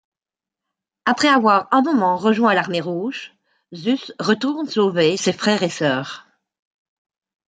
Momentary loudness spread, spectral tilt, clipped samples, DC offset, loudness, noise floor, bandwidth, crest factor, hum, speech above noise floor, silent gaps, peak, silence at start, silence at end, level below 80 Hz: 10 LU; -4.5 dB/octave; under 0.1%; under 0.1%; -19 LUFS; -89 dBFS; 9.4 kHz; 18 dB; none; 71 dB; none; -2 dBFS; 1.05 s; 1.25 s; -68 dBFS